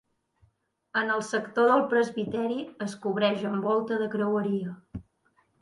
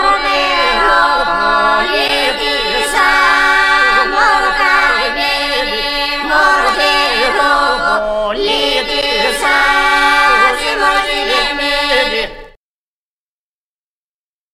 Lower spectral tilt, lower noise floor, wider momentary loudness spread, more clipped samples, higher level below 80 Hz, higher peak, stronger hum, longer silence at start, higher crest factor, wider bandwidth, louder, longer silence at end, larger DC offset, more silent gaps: first, -5.5 dB/octave vs -1 dB/octave; second, -69 dBFS vs under -90 dBFS; first, 12 LU vs 5 LU; neither; second, -62 dBFS vs -34 dBFS; second, -10 dBFS vs 0 dBFS; neither; first, 0.95 s vs 0 s; first, 18 dB vs 12 dB; second, 11.5 kHz vs 16 kHz; second, -27 LUFS vs -11 LUFS; second, 0.6 s vs 2.05 s; neither; neither